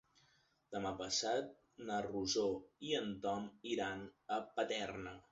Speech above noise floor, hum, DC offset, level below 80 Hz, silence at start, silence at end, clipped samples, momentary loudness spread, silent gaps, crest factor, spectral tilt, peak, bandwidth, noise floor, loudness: 34 dB; none; under 0.1%; -70 dBFS; 0.7 s; 0.1 s; under 0.1%; 11 LU; none; 18 dB; -2.5 dB/octave; -24 dBFS; 7.6 kHz; -75 dBFS; -41 LUFS